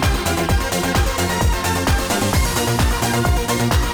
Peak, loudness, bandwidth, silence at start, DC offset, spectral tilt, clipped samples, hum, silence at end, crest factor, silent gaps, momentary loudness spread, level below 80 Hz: -6 dBFS; -18 LUFS; over 20 kHz; 0 s; under 0.1%; -4 dB/octave; under 0.1%; none; 0 s; 10 dB; none; 1 LU; -22 dBFS